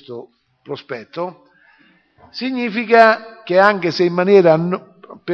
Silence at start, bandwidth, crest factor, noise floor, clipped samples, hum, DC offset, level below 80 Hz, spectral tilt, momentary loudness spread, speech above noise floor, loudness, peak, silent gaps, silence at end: 0.1 s; 6.8 kHz; 18 dB; -54 dBFS; under 0.1%; none; under 0.1%; -66 dBFS; -7 dB/octave; 21 LU; 38 dB; -15 LUFS; 0 dBFS; none; 0 s